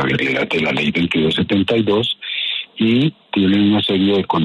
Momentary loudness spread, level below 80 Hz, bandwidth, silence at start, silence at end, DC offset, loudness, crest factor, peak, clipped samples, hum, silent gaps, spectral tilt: 5 LU; -50 dBFS; 11 kHz; 0 s; 0 s; under 0.1%; -17 LUFS; 12 dB; -4 dBFS; under 0.1%; none; none; -7 dB/octave